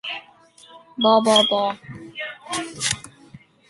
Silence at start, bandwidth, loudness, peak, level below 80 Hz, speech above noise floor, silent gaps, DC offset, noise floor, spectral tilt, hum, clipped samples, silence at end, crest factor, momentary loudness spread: 0.05 s; 11.5 kHz; -20 LUFS; -2 dBFS; -60 dBFS; 31 dB; none; under 0.1%; -50 dBFS; -2.5 dB/octave; none; under 0.1%; 0.3 s; 22 dB; 19 LU